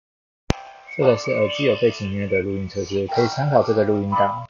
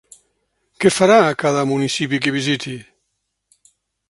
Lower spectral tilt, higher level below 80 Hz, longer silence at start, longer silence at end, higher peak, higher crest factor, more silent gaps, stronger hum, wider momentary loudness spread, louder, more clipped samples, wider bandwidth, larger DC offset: about the same, -5 dB/octave vs -4.5 dB/octave; first, -44 dBFS vs -60 dBFS; second, 0.5 s vs 0.8 s; second, 0.05 s vs 1.3 s; about the same, 0 dBFS vs 0 dBFS; about the same, 20 dB vs 20 dB; neither; neither; about the same, 9 LU vs 10 LU; second, -21 LUFS vs -17 LUFS; neither; second, 7.4 kHz vs 11.5 kHz; neither